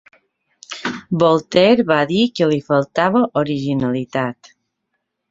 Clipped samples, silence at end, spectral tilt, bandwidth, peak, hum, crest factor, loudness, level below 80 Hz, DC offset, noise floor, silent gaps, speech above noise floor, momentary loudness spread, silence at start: under 0.1%; 1 s; -6.5 dB/octave; 7.8 kHz; -2 dBFS; none; 16 dB; -17 LUFS; -56 dBFS; under 0.1%; -74 dBFS; none; 58 dB; 13 LU; 0.7 s